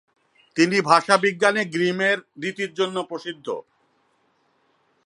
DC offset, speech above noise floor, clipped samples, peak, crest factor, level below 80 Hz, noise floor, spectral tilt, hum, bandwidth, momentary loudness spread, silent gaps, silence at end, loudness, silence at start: under 0.1%; 44 dB; under 0.1%; 0 dBFS; 24 dB; -74 dBFS; -66 dBFS; -4 dB/octave; none; 11.5 kHz; 15 LU; none; 1.45 s; -21 LUFS; 0.55 s